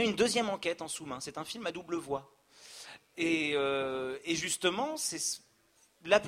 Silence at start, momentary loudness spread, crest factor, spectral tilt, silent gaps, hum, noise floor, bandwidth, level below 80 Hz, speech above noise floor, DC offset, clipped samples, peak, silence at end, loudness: 0 s; 17 LU; 24 dB; -2.5 dB/octave; none; none; -68 dBFS; 16 kHz; -70 dBFS; 34 dB; under 0.1%; under 0.1%; -10 dBFS; 0 s; -33 LUFS